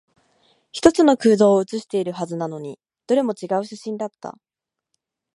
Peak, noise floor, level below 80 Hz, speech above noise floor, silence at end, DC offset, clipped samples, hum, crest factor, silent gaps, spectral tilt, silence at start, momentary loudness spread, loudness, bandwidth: 0 dBFS; -77 dBFS; -58 dBFS; 57 dB; 1.05 s; under 0.1%; under 0.1%; none; 22 dB; none; -5.5 dB/octave; 0.75 s; 19 LU; -20 LUFS; 11.5 kHz